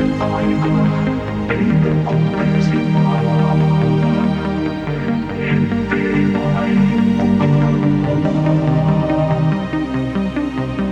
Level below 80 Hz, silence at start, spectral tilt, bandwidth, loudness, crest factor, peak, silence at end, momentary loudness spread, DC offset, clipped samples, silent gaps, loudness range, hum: -36 dBFS; 0 s; -8.5 dB/octave; 7.2 kHz; -16 LUFS; 12 dB; -2 dBFS; 0 s; 6 LU; under 0.1%; under 0.1%; none; 2 LU; none